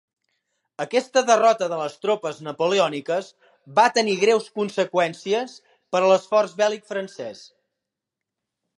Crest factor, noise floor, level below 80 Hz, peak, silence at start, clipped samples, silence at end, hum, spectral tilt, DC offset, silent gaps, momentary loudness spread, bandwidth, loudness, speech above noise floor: 20 dB; -85 dBFS; -80 dBFS; -4 dBFS; 0.8 s; under 0.1%; 1.4 s; none; -3.5 dB/octave; under 0.1%; none; 13 LU; 11.5 kHz; -22 LUFS; 64 dB